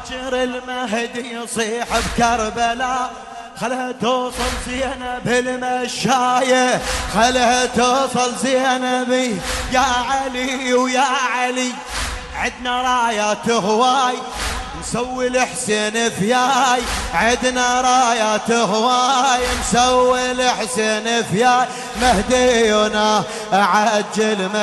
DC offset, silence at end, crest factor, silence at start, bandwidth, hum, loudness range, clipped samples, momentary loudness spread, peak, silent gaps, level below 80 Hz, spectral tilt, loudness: under 0.1%; 0 s; 14 dB; 0 s; 12 kHz; none; 5 LU; under 0.1%; 9 LU; -4 dBFS; none; -38 dBFS; -3 dB/octave; -17 LUFS